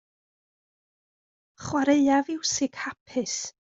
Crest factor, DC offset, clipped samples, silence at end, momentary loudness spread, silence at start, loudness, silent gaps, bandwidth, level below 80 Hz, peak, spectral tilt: 18 dB; under 0.1%; under 0.1%; 0.1 s; 11 LU; 1.6 s; -25 LUFS; 3.00-3.06 s; 8 kHz; -66 dBFS; -10 dBFS; -3 dB/octave